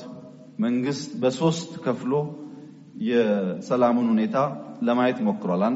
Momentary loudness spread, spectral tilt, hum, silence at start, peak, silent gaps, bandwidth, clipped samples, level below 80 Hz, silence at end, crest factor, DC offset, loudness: 19 LU; -6 dB/octave; none; 0 s; -10 dBFS; none; 8 kHz; under 0.1%; -70 dBFS; 0 s; 16 dB; under 0.1%; -24 LUFS